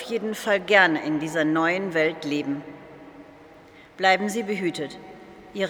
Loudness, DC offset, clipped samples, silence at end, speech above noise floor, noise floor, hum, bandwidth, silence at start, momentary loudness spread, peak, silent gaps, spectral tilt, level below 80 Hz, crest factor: -23 LUFS; under 0.1%; under 0.1%; 0 s; 26 dB; -49 dBFS; none; 18.5 kHz; 0 s; 20 LU; -2 dBFS; none; -4.5 dB/octave; -66 dBFS; 22 dB